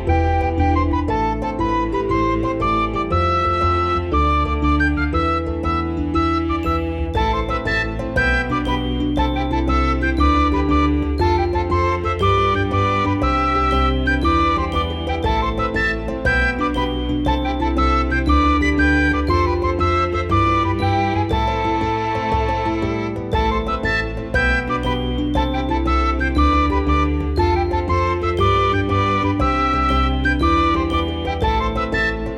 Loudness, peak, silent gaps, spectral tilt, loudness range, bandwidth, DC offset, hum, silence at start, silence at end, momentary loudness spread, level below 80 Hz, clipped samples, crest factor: -19 LUFS; -4 dBFS; none; -7 dB/octave; 2 LU; 9 kHz; under 0.1%; none; 0 s; 0 s; 5 LU; -24 dBFS; under 0.1%; 14 dB